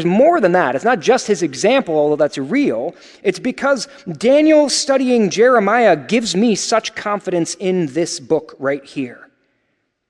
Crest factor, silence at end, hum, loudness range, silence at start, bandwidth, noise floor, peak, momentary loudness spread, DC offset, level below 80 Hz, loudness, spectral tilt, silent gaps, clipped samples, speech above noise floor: 16 dB; 0.95 s; none; 5 LU; 0 s; 11.5 kHz; -68 dBFS; 0 dBFS; 10 LU; under 0.1%; -62 dBFS; -16 LUFS; -4.5 dB/octave; none; under 0.1%; 53 dB